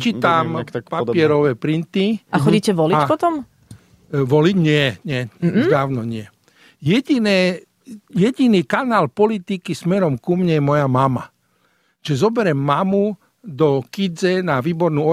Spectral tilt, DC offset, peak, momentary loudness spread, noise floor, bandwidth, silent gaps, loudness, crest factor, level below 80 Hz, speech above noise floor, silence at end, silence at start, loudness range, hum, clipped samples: -7 dB/octave; under 0.1%; -2 dBFS; 10 LU; -62 dBFS; 14.5 kHz; none; -18 LUFS; 16 dB; -56 dBFS; 45 dB; 0 s; 0 s; 2 LU; none; under 0.1%